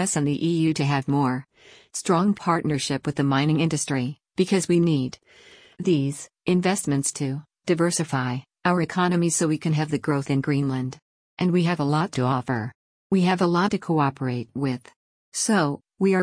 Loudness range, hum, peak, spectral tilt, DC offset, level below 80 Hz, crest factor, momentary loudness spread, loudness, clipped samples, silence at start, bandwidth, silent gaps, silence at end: 1 LU; none; -8 dBFS; -5.5 dB/octave; under 0.1%; -62 dBFS; 16 dB; 8 LU; -24 LUFS; under 0.1%; 0 s; 10.5 kHz; 11.02-11.37 s, 12.75-13.10 s, 14.96-15.32 s; 0 s